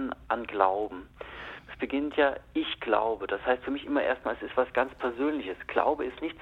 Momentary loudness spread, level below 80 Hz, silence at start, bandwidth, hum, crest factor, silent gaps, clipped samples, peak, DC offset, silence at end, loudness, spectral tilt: 11 LU; -56 dBFS; 0 s; 6 kHz; none; 22 dB; none; under 0.1%; -8 dBFS; under 0.1%; 0 s; -29 LUFS; -6.5 dB/octave